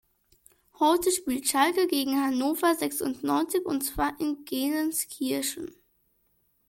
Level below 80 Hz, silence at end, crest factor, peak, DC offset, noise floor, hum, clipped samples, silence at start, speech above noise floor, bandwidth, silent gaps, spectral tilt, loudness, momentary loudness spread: -54 dBFS; 1 s; 18 dB; -10 dBFS; under 0.1%; -70 dBFS; none; under 0.1%; 0.8 s; 43 dB; 17 kHz; none; -2.5 dB/octave; -27 LUFS; 7 LU